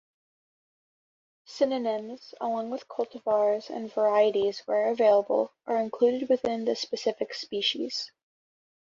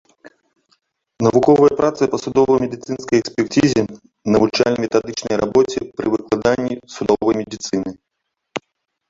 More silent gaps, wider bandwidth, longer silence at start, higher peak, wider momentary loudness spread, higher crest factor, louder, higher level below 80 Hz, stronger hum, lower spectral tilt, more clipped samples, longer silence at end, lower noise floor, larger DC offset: neither; about the same, 7.6 kHz vs 7.8 kHz; first, 1.5 s vs 0.25 s; second, -10 dBFS vs -2 dBFS; about the same, 11 LU vs 13 LU; about the same, 18 dB vs 16 dB; second, -27 LUFS vs -18 LUFS; second, -74 dBFS vs -50 dBFS; neither; second, -4 dB/octave vs -5.5 dB/octave; neither; first, 0.85 s vs 0.5 s; first, under -90 dBFS vs -76 dBFS; neither